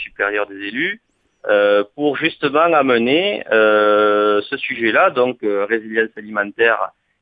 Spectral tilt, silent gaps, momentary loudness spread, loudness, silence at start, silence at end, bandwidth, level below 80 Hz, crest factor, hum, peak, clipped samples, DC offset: -7 dB/octave; none; 9 LU; -16 LUFS; 0 s; 0.3 s; 4.9 kHz; -64 dBFS; 16 dB; none; -2 dBFS; under 0.1%; under 0.1%